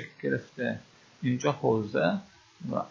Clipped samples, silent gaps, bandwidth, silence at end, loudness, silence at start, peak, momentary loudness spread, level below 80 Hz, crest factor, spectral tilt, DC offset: under 0.1%; none; 7.4 kHz; 0 s; -30 LUFS; 0 s; -10 dBFS; 9 LU; -66 dBFS; 20 dB; -6.5 dB/octave; under 0.1%